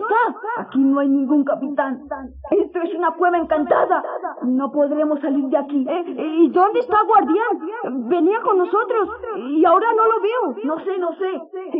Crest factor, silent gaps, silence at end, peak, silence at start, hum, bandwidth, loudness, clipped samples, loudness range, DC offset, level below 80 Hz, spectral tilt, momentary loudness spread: 16 dB; none; 0 s; -4 dBFS; 0 s; none; 4 kHz; -19 LUFS; under 0.1%; 2 LU; under 0.1%; -56 dBFS; -3.5 dB/octave; 10 LU